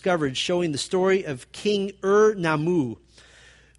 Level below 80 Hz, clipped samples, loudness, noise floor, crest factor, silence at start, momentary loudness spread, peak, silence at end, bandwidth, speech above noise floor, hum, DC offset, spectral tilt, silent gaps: -58 dBFS; under 0.1%; -23 LUFS; -52 dBFS; 16 dB; 0.05 s; 10 LU; -8 dBFS; 0.85 s; 11.5 kHz; 30 dB; none; under 0.1%; -5 dB/octave; none